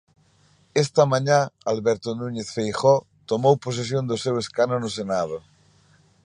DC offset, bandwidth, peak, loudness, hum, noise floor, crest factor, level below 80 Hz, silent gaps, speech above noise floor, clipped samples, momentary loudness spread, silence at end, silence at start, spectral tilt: under 0.1%; 10.5 kHz; -4 dBFS; -23 LUFS; none; -59 dBFS; 20 dB; -62 dBFS; none; 37 dB; under 0.1%; 9 LU; 0.85 s; 0.75 s; -5.5 dB/octave